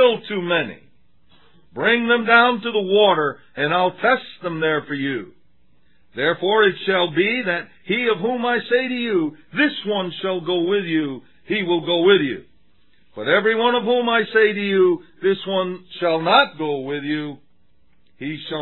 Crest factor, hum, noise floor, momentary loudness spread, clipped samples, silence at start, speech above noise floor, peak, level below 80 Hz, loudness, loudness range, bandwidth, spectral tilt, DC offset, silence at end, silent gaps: 20 dB; none; -63 dBFS; 11 LU; under 0.1%; 0 s; 44 dB; 0 dBFS; -70 dBFS; -19 LUFS; 4 LU; 4.3 kHz; -8 dB/octave; 0.3%; 0 s; none